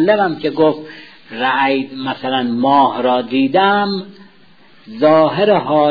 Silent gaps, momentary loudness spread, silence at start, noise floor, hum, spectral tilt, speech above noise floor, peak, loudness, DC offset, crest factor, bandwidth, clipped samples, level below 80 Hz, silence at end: none; 11 LU; 0 s; -48 dBFS; none; -8 dB/octave; 34 dB; -2 dBFS; -15 LUFS; 0.4%; 14 dB; 5 kHz; under 0.1%; -62 dBFS; 0 s